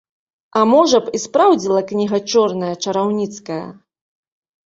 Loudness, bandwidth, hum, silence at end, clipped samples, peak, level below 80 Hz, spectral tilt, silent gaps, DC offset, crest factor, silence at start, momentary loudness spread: -16 LUFS; 8 kHz; none; 0.95 s; under 0.1%; -2 dBFS; -62 dBFS; -4.5 dB/octave; none; under 0.1%; 16 dB; 0.55 s; 13 LU